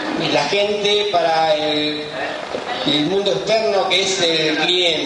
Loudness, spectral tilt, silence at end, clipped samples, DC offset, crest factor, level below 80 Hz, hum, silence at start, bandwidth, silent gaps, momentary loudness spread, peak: -17 LUFS; -3 dB/octave; 0 s; under 0.1%; under 0.1%; 14 dB; -58 dBFS; none; 0 s; 11 kHz; none; 9 LU; -4 dBFS